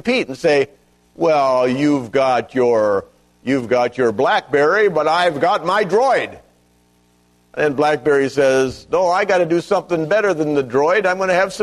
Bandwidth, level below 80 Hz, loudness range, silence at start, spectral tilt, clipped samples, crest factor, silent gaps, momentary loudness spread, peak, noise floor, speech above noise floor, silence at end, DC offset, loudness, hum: 12.5 kHz; -56 dBFS; 2 LU; 0.05 s; -5 dB/octave; under 0.1%; 14 dB; none; 5 LU; -4 dBFS; -56 dBFS; 40 dB; 0 s; under 0.1%; -17 LUFS; 60 Hz at -50 dBFS